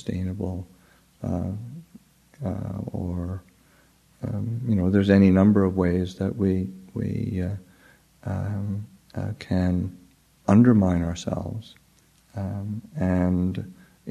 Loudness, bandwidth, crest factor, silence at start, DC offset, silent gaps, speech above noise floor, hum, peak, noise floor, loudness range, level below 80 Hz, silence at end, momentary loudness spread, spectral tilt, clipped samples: -25 LUFS; 10 kHz; 22 dB; 0.05 s; under 0.1%; none; 36 dB; none; -4 dBFS; -59 dBFS; 11 LU; -48 dBFS; 0 s; 19 LU; -8.5 dB/octave; under 0.1%